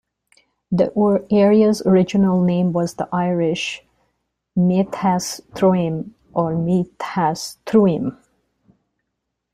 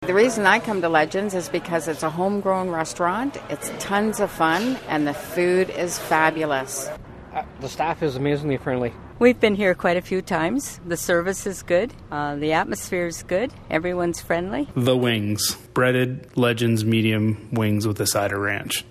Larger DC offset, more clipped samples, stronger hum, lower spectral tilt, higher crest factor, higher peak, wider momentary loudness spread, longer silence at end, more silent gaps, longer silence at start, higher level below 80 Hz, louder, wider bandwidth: neither; neither; neither; first, -7 dB/octave vs -4.5 dB/octave; about the same, 16 dB vs 20 dB; about the same, -2 dBFS vs -2 dBFS; first, 11 LU vs 8 LU; first, 1.4 s vs 0.1 s; neither; first, 0.7 s vs 0 s; second, -56 dBFS vs -50 dBFS; first, -19 LUFS vs -22 LUFS; about the same, 14 kHz vs 14 kHz